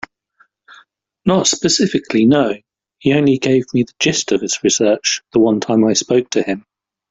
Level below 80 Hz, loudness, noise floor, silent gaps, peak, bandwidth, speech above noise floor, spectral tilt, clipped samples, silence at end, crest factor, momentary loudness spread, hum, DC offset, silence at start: -54 dBFS; -15 LUFS; -57 dBFS; none; -2 dBFS; 8.2 kHz; 42 dB; -4 dB/octave; under 0.1%; 0.5 s; 16 dB; 7 LU; none; under 0.1%; 1.25 s